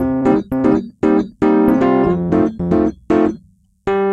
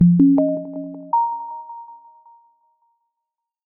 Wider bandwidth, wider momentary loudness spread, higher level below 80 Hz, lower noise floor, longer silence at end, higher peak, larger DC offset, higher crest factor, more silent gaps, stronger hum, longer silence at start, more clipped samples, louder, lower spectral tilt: first, 12 kHz vs 1.3 kHz; second, 6 LU vs 23 LU; first, -40 dBFS vs -58 dBFS; second, -49 dBFS vs -83 dBFS; second, 0 s vs 1.75 s; about the same, 0 dBFS vs -2 dBFS; neither; about the same, 16 dB vs 18 dB; neither; neither; about the same, 0 s vs 0 s; neither; first, -16 LUFS vs -19 LUFS; second, -9 dB/octave vs -15.5 dB/octave